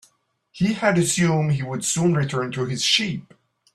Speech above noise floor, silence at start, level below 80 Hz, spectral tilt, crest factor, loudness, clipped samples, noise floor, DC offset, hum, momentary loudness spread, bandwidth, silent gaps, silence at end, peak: 42 dB; 0.55 s; -56 dBFS; -4 dB/octave; 18 dB; -21 LUFS; under 0.1%; -64 dBFS; under 0.1%; none; 7 LU; 13.5 kHz; none; 0.5 s; -4 dBFS